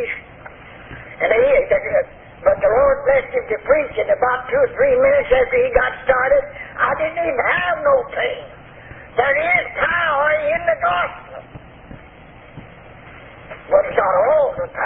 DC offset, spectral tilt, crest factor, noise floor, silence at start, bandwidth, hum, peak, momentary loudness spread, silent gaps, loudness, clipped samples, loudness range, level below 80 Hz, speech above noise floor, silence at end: under 0.1%; -9.5 dB/octave; 18 dB; -42 dBFS; 0 s; 3.9 kHz; none; 0 dBFS; 17 LU; none; -17 LUFS; under 0.1%; 6 LU; -42 dBFS; 25 dB; 0 s